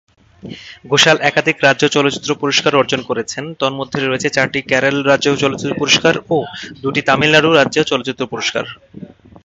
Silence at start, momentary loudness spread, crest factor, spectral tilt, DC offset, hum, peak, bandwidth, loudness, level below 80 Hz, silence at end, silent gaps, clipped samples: 0.45 s; 13 LU; 16 dB; -3.5 dB/octave; under 0.1%; none; 0 dBFS; 8.4 kHz; -14 LUFS; -52 dBFS; 0.4 s; none; under 0.1%